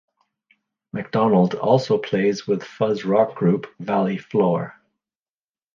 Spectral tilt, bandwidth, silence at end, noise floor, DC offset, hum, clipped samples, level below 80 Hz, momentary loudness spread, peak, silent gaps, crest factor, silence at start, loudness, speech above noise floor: -7.5 dB/octave; 7.2 kHz; 1.05 s; under -90 dBFS; under 0.1%; none; under 0.1%; -64 dBFS; 8 LU; -4 dBFS; none; 18 dB; 0.95 s; -21 LUFS; over 70 dB